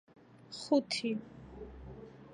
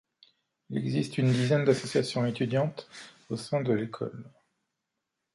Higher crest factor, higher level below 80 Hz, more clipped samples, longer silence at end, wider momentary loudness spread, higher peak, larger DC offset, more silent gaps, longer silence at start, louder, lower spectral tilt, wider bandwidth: about the same, 22 dB vs 20 dB; first, -60 dBFS vs -68 dBFS; neither; second, 0 s vs 1.05 s; first, 20 LU vs 15 LU; second, -16 dBFS vs -10 dBFS; neither; neither; second, 0.35 s vs 0.7 s; second, -34 LUFS vs -29 LUFS; second, -4.5 dB/octave vs -6.5 dB/octave; about the same, 11 kHz vs 11.5 kHz